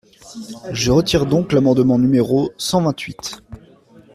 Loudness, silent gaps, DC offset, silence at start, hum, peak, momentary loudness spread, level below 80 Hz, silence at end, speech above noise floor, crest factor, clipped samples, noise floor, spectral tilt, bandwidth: -17 LUFS; none; under 0.1%; 0.25 s; none; -4 dBFS; 19 LU; -42 dBFS; 0.6 s; 30 dB; 14 dB; under 0.1%; -47 dBFS; -5.5 dB/octave; 14.5 kHz